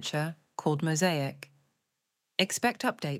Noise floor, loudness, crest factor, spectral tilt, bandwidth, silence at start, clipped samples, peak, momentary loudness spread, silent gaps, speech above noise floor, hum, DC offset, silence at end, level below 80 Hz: -83 dBFS; -30 LUFS; 24 dB; -4 dB/octave; 16.5 kHz; 0 s; under 0.1%; -6 dBFS; 9 LU; none; 53 dB; none; under 0.1%; 0 s; -78 dBFS